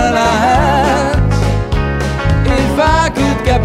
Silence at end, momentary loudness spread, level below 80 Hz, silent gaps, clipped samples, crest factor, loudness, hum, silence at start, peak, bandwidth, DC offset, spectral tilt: 0 s; 5 LU; -20 dBFS; none; under 0.1%; 12 dB; -13 LUFS; none; 0 s; 0 dBFS; 15 kHz; under 0.1%; -6 dB/octave